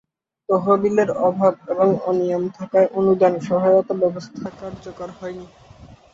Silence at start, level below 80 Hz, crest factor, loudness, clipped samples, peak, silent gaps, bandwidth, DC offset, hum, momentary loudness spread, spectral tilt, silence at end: 0.5 s; -58 dBFS; 16 dB; -19 LUFS; under 0.1%; -4 dBFS; none; 7.6 kHz; under 0.1%; none; 17 LU; -8 dB/octave; 0.2 s